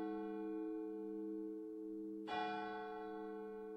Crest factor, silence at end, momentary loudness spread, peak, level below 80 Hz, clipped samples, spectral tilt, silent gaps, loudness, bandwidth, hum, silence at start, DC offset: 14 dB; 0 s; 5 LU; -32 dBFS; -82 dBFS; under 0.1%; -7 dB/octave; none; -46 LUFS; 7.8 kHz; none; 0 s; under 0.1%